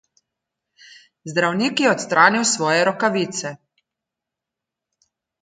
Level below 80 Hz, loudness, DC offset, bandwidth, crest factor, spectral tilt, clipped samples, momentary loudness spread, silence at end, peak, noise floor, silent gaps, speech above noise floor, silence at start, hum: -70 dBFS; -18 LUFS; under 0.1%; 9.6 kHz; 22 dB; -3 dB/octave; under 0.1%; 12 LU; 1.9 s; 0 dBFS; -85 dBFS; none; 66 dB; 1.25 s; none